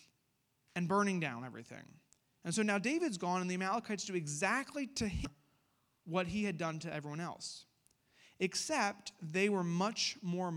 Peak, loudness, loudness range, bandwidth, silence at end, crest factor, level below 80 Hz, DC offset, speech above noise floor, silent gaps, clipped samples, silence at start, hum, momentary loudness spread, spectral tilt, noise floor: -18 dBFS; -37 LUFS; 4 LU; 14 kHz; 0 s; 20 dB; -60 dBFS; under 0.1%; 42 dB; none; under 0.1%; 0.75 s; none; 13 LU; -4.5 dB/octave; -79 dBFS